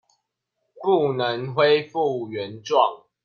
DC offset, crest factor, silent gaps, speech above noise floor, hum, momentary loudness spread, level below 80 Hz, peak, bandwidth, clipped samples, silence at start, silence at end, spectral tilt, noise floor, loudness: under 0.1%; 18 dB; none; 56 dB; none; 10 LU; -70 dBFS; -4 dBFS; 6.8 kHz; under 0.1%; 0.75 s; 0.3 s; -6 dB/octave; -78 dBFS; -22 LUFS